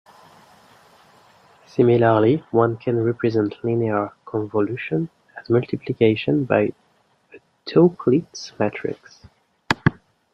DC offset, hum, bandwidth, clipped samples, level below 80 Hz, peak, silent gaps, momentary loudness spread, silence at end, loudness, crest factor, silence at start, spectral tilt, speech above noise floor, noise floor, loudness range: under 0.1%; none; 8 kHz; under 0.1%; -56 dBFS; -2 dBFS; none; 13 LU; 0.45 s; -21 LUFS; 20 dB; 1.75 s; -7.5 dB/octave; 42 dB; -62 dBFS; 3 LU